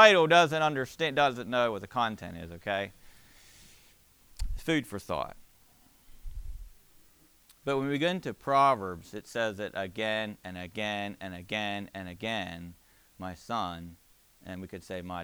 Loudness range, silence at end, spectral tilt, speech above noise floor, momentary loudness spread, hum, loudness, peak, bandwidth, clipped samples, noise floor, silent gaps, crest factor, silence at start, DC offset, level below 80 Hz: 8 LU; 0 s; -4.5 dB/octave; 31 dB; 19 LU; none; -30 LUFS; -4 dBFS; over 20 kHz; under 0.1%; -61 dBFS; none; 26 dB; 0 s; under 0.1%; -50 dBFS